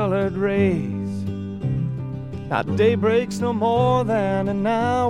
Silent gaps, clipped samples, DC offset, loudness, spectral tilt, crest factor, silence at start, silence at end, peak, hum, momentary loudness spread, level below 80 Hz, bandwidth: none; under 0.1%; under 0.1%; -22 LUFS; -7.5 dB/octave; 16 dB; 0 s; 0 s; -6 dBFS; none; 9 LU; -46 dBFS; 11.5 kHz